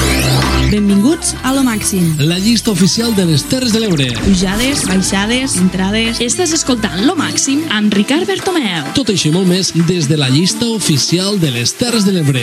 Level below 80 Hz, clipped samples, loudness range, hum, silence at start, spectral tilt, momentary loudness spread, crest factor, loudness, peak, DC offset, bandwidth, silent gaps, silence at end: -30 dBFS; under 0.1%; 1 LU; none; 0 s; -4 dB/octave; 3 LU; 12 dB; -13 LUFS; 0 dBFS; under 0.1%; 16 kHz; none; 0 s